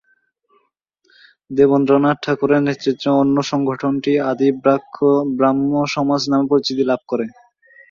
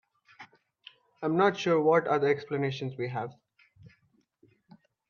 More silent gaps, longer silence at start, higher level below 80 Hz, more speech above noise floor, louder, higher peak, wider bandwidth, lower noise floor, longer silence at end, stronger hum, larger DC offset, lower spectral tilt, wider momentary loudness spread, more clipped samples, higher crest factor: neither; first, 1.5 s vs 0.4 s; first, -60 dBFS vs -76 dBFS; first, 49 dB vs 43 dB; first, -17 LUFS vs -28 LUFS; first, -2 dBFS vs -10 dBFS; about the same, 7.4 kHz vs 7.2 kHz; second, -65 dBFS vs -70 dBFS; second, 0.6 s vs 1.2 s; neither; neither; about the same, -6.5 dB/octave vs -6.5 dB/octave; second, 5 LU vs 12 LU; neither; about the same, 16 dB vs 20 dB